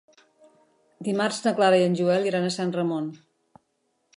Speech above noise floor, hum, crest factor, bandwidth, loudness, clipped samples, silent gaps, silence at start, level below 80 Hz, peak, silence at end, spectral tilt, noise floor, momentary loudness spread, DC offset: 50 dB; none; 18 dB; 11.5 kHz; -24 LUFS; under 0.1%; none; 1 s; -76 dBFS; -8 dBFS; 1 s; -5.5 dB/octave; -73 dBFS; 11 LU; under 0.1%